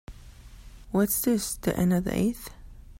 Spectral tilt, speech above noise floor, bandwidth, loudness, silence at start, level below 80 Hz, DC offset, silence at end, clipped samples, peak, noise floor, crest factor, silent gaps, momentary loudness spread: -5.5 dB/octave; 21 dB; 16.5 kHz; -26 LUFS; 0.1 s; -46 dBFS; under 0.1%; 0.05 s; under 0.1%; -12 dBFS; -47 dBFS; 16 dB; none; 8 LU